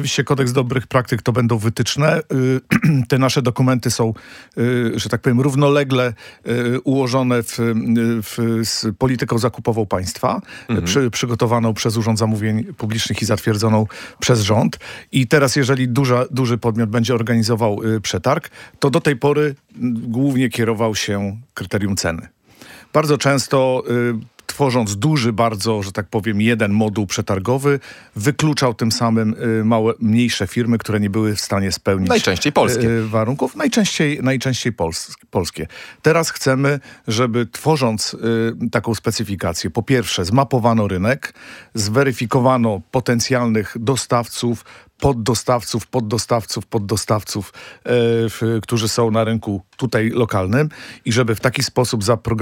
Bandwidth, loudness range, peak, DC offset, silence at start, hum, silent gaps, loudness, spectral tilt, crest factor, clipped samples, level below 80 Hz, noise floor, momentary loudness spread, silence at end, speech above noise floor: 17 kHz; 2 LU; -2 dBFS; under 0.1%; 0 s; none; none; -18 LUFS; -5.5 dB/octave; 16 dB; under 0.1%; -50 dBFS; -43 dBFS; 7 LU; 0 s; 25 dB